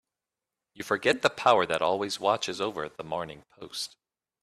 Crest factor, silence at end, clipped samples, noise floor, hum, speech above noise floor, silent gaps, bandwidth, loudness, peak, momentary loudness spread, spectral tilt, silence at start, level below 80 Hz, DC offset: 22 dB; 0.55 s; under 0.1%; -89 dBFS; none; 61 dB; none; 14 kHz; -28 LUFS; -8 dBFS; 16 LU; -3 dB/octave; 0.75 s; -68 dBFS; under 0.1%